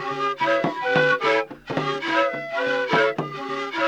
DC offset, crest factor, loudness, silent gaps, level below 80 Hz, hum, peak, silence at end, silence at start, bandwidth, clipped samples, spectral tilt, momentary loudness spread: under 0.1%; 16 dB; -22 LUFS; none; -66 dBFS; none; -8 dBFS; 0 s; 0 s; 10 kHz; under 0.1%; -5 dB/octave; 9 LU